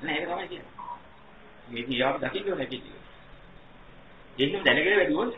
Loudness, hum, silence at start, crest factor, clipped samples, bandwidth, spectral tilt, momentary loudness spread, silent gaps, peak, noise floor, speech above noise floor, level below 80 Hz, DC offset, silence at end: -26 LUFS; none; 0 s; 26 dB; under 0.1%; 5.8 kHz; -7 dB/octave; 20 LU; none; -4 dBFS; -52 dBFS; 25 dB; -58 dBFS; 0.2%; 0 s